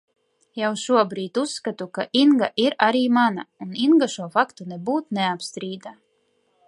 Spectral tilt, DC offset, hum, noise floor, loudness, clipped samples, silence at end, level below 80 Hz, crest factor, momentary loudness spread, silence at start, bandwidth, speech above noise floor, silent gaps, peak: -4.5 dB/octave; under 0.1%; none; -67 dBFS; -22 LUFS; under 0.1%; 0.75 s; -76 dBFS; 20 dB; 14 LU; 0.55 s; 11.5 kHz; 46 dB; none; -2 dBFS